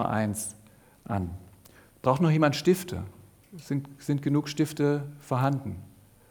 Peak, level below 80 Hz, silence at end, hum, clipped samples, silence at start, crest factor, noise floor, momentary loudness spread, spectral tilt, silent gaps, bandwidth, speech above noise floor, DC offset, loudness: -8 dBFS; -58 dBFS; 0.4 s; none; under 0.1%; 0 s; 22 dB; -55 dBFS; 15 LU; -6.5 dB/octave; none; over 20 kHz; 28 dB; under 0.1%; -28 LUFS